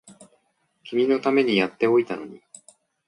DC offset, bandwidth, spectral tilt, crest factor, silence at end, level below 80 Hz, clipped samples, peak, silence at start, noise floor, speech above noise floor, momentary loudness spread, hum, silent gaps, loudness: under 0.1%; 10.5 kHz; -5.5 dB/octave; 18 dB; 0.7 s; -72 dBFS; under 0.1%; -8 dBFS; 0.05 s; -69 dBFS; 47 dB; 13 LU; none; none; -22 LUFS